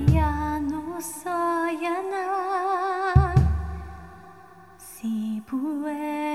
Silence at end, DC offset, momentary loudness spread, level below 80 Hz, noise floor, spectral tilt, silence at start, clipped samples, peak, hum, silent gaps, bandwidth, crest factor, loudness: 0 s; 0.1%; 16 LU; -32 dBFS; -49 dBFS; -7 dB/octave; 0 s; under 0.1%; -2 dBFS; none; none; 14.5 kHz; 22 dB; -26 LUFS